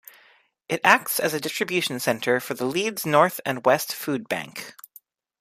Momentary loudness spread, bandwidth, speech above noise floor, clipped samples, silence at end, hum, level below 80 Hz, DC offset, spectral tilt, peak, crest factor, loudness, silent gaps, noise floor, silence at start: 11 LU; 15.5 kHz; 35 dB; under 0.1%; 0.7 s; none; -70 dBFS; under 0.1%; -3.5 dB/octave; 0 dBFS; 24 dB; -23 LUFS; none; -59 dBFS; 0.7 s